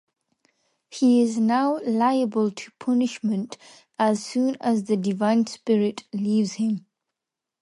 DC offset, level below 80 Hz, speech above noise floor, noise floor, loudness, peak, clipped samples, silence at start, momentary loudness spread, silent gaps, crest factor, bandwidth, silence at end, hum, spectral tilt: under 0.1%; -74 dBFS; 64 dB; -87 dBFS; -23 LUFS; -10 dBFS; under 0.1%; 0.9 s; 9 LU; none; 14 dB; 11.5 kHz; 0.85 s; none; -6 dB/octave